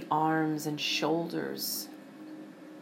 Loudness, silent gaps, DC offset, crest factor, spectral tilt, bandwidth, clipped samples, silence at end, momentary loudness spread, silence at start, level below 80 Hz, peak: -31 LUFS; none; under 0.1%; 18 dB; -4 dB/octave; 16.5 kHz; under 0.1%; 0 s; 19 LU; 0 s; -88 dBFS; -14 dBFS